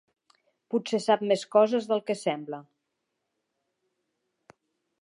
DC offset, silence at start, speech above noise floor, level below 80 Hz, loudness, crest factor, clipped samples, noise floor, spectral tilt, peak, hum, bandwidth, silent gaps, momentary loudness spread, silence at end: under 0.1%; 0.7 s; 55 dB; -86 dBFS; -26 LUFS; 22 dB; under 0.1%; -81 dBFS; -5 dB/octave; -8 dBFS; none; 11.5 kHz; none; 12 LU; 2.45 s